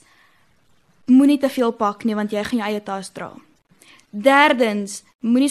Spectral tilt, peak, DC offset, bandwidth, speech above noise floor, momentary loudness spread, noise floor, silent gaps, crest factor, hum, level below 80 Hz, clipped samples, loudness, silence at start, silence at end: -4.5 dB/octave; -2 dBFS; under 0.1%; 13 kHz; 42 dB; 19 LU; -60 dBFS; 5.15-5.19 s; 18 dB; none; -64 dBFS; under 0.1%; -18 LUFS; 1.1 s; 0 s